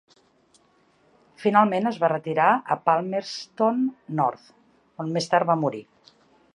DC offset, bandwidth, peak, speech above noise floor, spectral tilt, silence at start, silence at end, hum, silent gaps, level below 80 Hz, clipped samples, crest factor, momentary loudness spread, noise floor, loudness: under 0.1%; 11 kHz; -4 dBFS; 39 dB; -6 dB/octave; 1.4 s; 0.75 s; none; none; -74 dBFS; under 0.1%; 20 dB; 9 LU; -62 dBFS; -23 LUFS